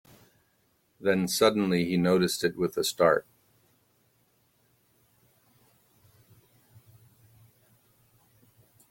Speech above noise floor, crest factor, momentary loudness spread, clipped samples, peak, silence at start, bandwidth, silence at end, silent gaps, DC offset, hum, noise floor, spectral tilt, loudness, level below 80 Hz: 45 dB; 24 dB; 5 LU; under 0.1%; -8 dBFS; 1 s; 16.5 kHz; 5.7 s; none; under 0.1%; none; -70 dBFS; -4.5 dB/octave; -26 LUFS; -68 dBFS